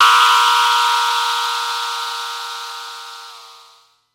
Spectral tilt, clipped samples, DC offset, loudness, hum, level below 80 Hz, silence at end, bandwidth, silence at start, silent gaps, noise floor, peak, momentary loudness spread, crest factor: 5 dB/octave; under 0.1%; under 0.1%; -15 LUFS; none; -78 dBFS; 0.6 s; 16.5 kHz; 0 s; none; -51 dBFS; 0 dBFS; 21 LU; 16 dB